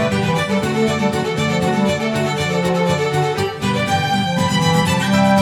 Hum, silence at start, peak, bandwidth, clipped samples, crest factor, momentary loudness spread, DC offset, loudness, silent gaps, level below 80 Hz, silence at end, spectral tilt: none; 0 s; -4 dBFS; 17 kHz; under 0.1%; 14 dB; 4 LU; under 0.1%; -17 LUFS; none; -46 dBFS; 0 s; -5.5 dB/octave